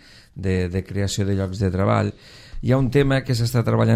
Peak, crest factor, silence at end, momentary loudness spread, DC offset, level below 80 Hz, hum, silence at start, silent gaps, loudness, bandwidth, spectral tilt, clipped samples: -4 dBFS; 16 dB; 0 s; 9 LU; under 0.1%; -38 dBFS; none; 0.35 s; none; -22 LUFS; 15.5 kHz; -6.5 dB/octave; under 0.1%